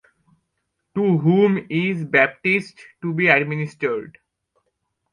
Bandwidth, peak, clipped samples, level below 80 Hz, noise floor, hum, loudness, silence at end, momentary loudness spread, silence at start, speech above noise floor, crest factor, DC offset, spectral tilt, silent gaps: 10 kHz; -2 dBFS; under 0.1%; -66 dBFS; -75 dBFS; none; -19 LUFS; 1.05 s; 13 LU; 0.95 s; 56 dB; 20 dB; under 0.1%; -8 dB/octave; none